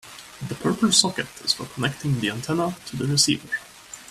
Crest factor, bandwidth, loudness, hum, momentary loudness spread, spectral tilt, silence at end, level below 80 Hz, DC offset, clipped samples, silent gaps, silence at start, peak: 22 dB; 15 kHz; -23 LUFS; none; 17 LU; -3 dB/octave; 0 s; -58 dBFS; under 0.1%; under 0.1%; none; 0.05 s; -2 dBFS